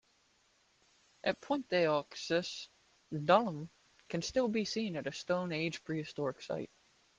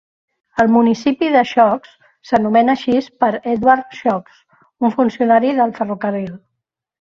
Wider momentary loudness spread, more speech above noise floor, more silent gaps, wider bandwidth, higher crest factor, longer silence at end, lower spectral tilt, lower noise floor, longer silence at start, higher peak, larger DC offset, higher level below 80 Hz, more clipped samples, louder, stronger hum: first, 14 LU vs 8 LU; second, 37 dB vs 63 dB; neither; first, 9.8 kHz vs 7.2 kHz; first, 24 dB vs 16 dB; second, 0.5 s vs 0.65 s; second, -5 dB/octave vs -6.5 dB/octave; second, -72 dBFS vs -78 dBFS; first, 1.25 s vs 0.55 s; second, -14 dBFS vs 0 dBFS; neither; second, -72 dBFS vs -56 dBFS; neither; second, -35 LUFS vs -16 LUFS; neither